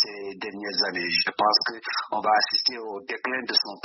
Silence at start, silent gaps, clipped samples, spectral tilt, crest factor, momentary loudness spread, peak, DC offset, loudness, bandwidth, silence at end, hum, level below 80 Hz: 0 s; none; under 0.1%; 1.5 dB/octave; 20 dB; 13 LU; -6 dBFS; under 0.1%; -24 LUFS; 6.2 kHz; 0.05 s; none; -74 dBFS